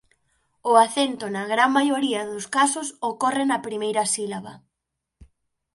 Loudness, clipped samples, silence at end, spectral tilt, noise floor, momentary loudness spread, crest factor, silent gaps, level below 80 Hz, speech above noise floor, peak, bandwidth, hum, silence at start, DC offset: -22 LUFS; under 0.1%; 0.5 s; -2.5 dB/octave; -83 dBFS; 11 LU; 22 dB; none; -64 dBFS; 60 dB; -2 dBFS; 11.5 kHz; none; 0.65 s; under 0.1%